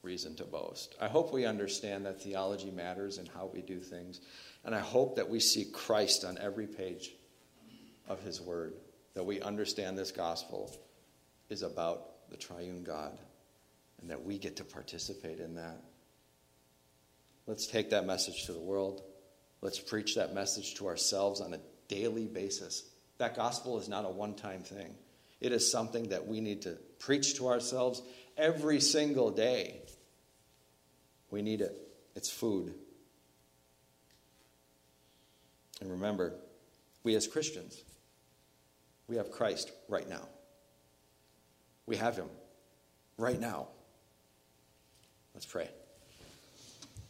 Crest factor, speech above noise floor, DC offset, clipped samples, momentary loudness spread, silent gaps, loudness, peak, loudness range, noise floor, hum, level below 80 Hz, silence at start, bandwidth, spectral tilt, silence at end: 24 dB; 33 dB; under 0.1%; under 0.1%; 19 LU; none; -36 LUFS; -14 dBFS; 11 LU; -69 dBFS; none; -72 dBFS; 0.05 s; 16 kHz; -3 dB/octave; 0 s